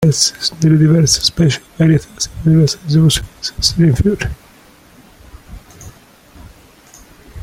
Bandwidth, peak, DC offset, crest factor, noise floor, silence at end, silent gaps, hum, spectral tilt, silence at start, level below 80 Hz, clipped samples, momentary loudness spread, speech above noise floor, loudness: 15.5 kHz; 0 dBFS; under 0.1%; 16 dB; -44 dBFS; 0 s; none; none; -5 dB/octave; 0 s; -34 dBFS; under 0.1%; 10 LU; 31 dB; -13 LUFS